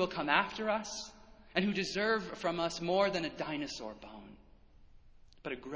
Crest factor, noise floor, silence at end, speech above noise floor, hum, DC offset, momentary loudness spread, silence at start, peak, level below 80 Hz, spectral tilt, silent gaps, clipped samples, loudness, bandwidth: 24 dB; -59 dBFS; 0 s; 25 dB; none; under 0.1%; 17 LU; 0 s; -12 dBFS; -62 dBFS; -4 dB/octave; none; under 0.1%; -34 LUFS; 8 kHz